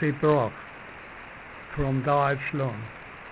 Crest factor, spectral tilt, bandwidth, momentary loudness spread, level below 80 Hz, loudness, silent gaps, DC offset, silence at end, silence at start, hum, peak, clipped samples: 18 dB; -11 dB/octave; 4 kHz; 18 LU; -50 dBFS; -26 LUFS; none; under 0.1%; 0 s; 0 s; none; -10 dBFS; under 0.1%